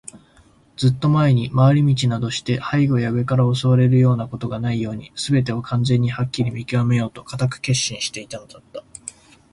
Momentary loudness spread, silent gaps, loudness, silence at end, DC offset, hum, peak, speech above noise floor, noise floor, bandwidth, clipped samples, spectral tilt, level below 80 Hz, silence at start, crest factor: 19 LU; none; -19 LUFS; 0.4 s; under 0.1%; none; -4 dBFS; 34 dB; -53 dBFS; 11.5 kHz; under 0.1%; -6 dB/octave; -50 dBFS; 0.15 s; 16 dB